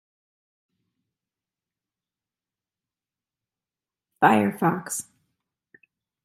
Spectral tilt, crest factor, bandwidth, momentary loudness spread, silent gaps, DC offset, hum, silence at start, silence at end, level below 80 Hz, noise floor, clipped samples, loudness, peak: -5 dB/octave; 28 dB; 15.5 kHz; 13 LU; none; under 0.1%; none; 4.2 s; 1.25 s; -74 dBFS; under -90 dBFS; under 0.1%; -23 LUFS; -2 dBFS